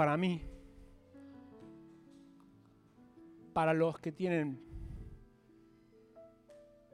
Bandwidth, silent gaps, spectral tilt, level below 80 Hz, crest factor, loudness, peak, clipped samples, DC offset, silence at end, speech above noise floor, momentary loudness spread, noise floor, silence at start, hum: 11.5 kHz; none; -7.5 dB/octave; -58 dBFS; 22 dB; -35 LUFS; -18 dBFS; under 0.1%; under 0.1%; 0.35 s; 31 dB; 28 LU; -64 dBFS; 0 s; none